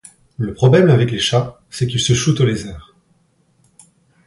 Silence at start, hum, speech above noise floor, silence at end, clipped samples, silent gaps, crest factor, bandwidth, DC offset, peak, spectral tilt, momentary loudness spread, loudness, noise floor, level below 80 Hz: 0.4 s; none; 44 dB; 1.45 s; under 0.1%; none; 16 dB; 11.5 kHz; under 0.1%; 0 dBFS; -5.5 dB/octave; 14 LU; -16 LUFS; -59 dBFS; -44 dBFS